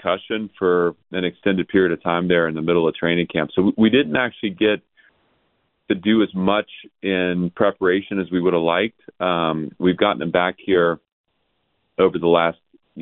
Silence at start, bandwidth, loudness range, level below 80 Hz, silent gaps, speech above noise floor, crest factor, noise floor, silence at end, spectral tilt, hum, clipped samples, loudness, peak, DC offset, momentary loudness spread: 0.05 s; 4.1 kHz; 3 LU; -58 dBFS; 11.12-11.24 s; 51 dB; 18 dB; -70 dBFS; 0 s; -11 dB/octave; none; under 0.1%; -20 LUFS; -2 dBFS; under 0.1%; 7 LU